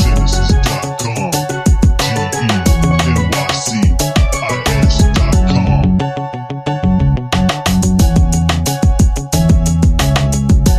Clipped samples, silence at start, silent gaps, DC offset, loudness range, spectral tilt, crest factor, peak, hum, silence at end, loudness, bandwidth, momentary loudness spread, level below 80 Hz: under 0.1%; 0 s; none; under 0.1%; 1 LU; -5.5 dB/octave; 12 dB; 0 dBFS; none; 0 s; -13 LUFS; 15.5 kHz; 5 LU; -16 dBFS